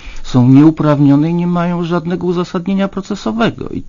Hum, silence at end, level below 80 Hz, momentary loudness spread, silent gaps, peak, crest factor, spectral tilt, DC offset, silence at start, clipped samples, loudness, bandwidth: none; 0 s; -34 dBFS; 9 LU; none; 0 dBFS; 12 dB; -8 dB/octave; under 0.1%; 0 s; 0.3%; -13 LUFS; 7.4 kHz